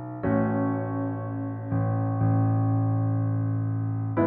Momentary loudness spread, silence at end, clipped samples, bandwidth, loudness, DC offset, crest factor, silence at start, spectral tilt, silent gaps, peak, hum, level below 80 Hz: 6 LU; 0 s; under 0.1%; 2.5 kHz; -27 LUFS; under 0.1%; 14 dB; 0 s; -14 dB/octave; none; -12 dBFS; none; -54 dBFS